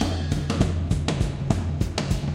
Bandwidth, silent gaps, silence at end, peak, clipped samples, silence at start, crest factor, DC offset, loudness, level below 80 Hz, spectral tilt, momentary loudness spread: 14 kHz; none; 0 s; -4 dBFS; under 0.1%; 0 s; 20 dB; under 0.1%; -25 LUFS; -32 dBFS; -6 dB/octave; 3 LU